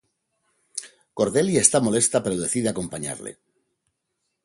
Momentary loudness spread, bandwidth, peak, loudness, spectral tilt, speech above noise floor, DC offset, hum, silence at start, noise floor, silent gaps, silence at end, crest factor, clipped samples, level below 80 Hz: 18 LU; 11.5 kHz; 0 dBFS; -21 LUFS; -4 dB/octave; 55 dB; under 0.1%; none; 0.75 s; -78 dBFS; none; 1.15 s; 26 dB; under 0.1%; -58 dBFS